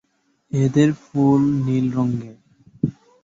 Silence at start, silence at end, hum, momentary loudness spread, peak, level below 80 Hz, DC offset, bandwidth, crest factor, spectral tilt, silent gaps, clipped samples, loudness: 0.55 s; 0.3 s; none; 10 LU; -4 dBFS; -54 dBFS; under 0.1%; 7.8 kHz; 16 dB; -8.5 dB/octave; none; under 0.1%; -20 LUFS